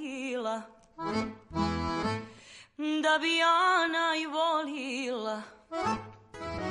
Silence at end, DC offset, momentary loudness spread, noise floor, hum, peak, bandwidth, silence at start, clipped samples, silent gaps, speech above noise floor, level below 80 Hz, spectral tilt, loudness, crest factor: 0 s; under 0.1%; 16 LU; -53 dBFS; none; -14 dBFS; 11.5 kHz; 0 s; under 0.1%; none; 26 dB; -54 dBFS; -4 dB/octave; -30 LUFS; 16 dB